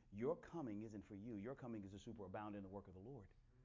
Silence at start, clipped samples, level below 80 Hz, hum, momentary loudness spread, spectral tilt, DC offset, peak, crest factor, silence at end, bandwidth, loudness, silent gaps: 0 s; under 0.1%; -72 dBFS; none; 12 LU; -8 dB/octave; under 0.1%; -34 dBFS; 18 dB; 0 s; 7.6 kHz; -52 LUFS; none